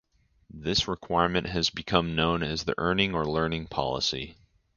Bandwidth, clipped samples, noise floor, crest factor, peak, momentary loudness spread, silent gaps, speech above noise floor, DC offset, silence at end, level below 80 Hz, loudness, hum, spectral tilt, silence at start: 7.4 kHz; under 0.1%; -57 dBFS; 24 dB; -4 dBFS; 5 LU; none; 30 dB; under 0.1%; 0.45 s; -46 dBFS; -27 LUFS; none; -4.5 dB/octave; 0.55 s